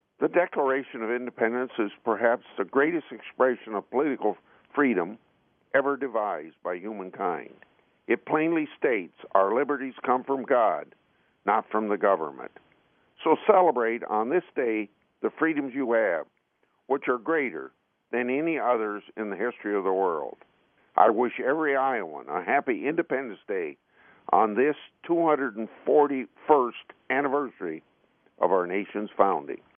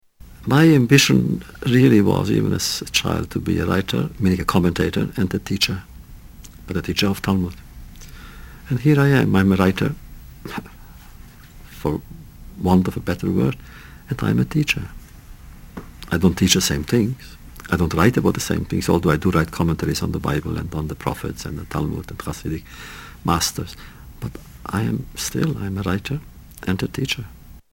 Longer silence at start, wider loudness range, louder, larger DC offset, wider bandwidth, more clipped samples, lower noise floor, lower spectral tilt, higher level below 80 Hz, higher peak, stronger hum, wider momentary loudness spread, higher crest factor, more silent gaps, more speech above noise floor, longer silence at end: about the same, 0.2 s vs 0.25 s; second, 4 LU vs 7 LU; second, -27 LUFS vs -20 LUFS; neither; second, 3.6 kHz vs 17.5 kHz; neither; first, -72 dBFS vs -42 dBFS; second, -4 dB/octave vs -5.5 dB/octave; second, -80 dBFS vs -38 dBFS; second, -4 dBFS vs 0 dBFS; neither; second, 11 LU vs 20 LU; about the same, 24 dB vs 20 dB; neither; first, 45 dB vs 22 dB; about the same, 0.2 s vs 0.15 s